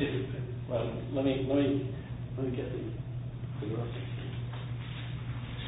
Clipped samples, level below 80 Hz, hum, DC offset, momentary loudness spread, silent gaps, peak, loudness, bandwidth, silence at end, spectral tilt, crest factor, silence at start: under 0.1%; -50 dBFS; none; under 0.1%; 10 LU; none; -16 dBFS; -35 LUFS; 3.9 kHz; 0 s; -7.5 dB/octave; 18 dB; 0 s